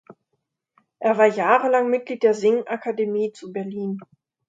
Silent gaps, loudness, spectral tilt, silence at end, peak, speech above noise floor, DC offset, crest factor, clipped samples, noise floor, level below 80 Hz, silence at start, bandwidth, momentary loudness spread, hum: none; -21 LUFS; -6 dB/octave; 0.45 s; -2 dBFS; 56 dB; under 0.1%; 20 dB; under 0.1%; -76 dBFS; -76 dBFS; 0.1 s; 7.8 kHz; 13 LU; none